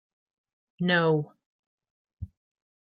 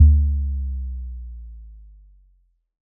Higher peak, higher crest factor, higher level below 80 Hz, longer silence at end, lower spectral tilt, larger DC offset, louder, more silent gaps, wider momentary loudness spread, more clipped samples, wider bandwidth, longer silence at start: second, -10 dBFS vs -2 dBFS; about the same, 20 dB vs 18 dB; second, -60 dBFS vs -22 dBFS; second, 0.6 s vs 1.2 s; second, -9.5 dB/octave vs -27 dB/octave; neither; second, -26 LUFS vs -23 LUFS; first, 1.46-1.78 s, 1.90-2.05 s, 2.13-2.17 s vs none; about the same, 22 LU vs 24 LU; neither; first, 5 kHz vs 0.4 kHz; first, 0.8 s vs 0 s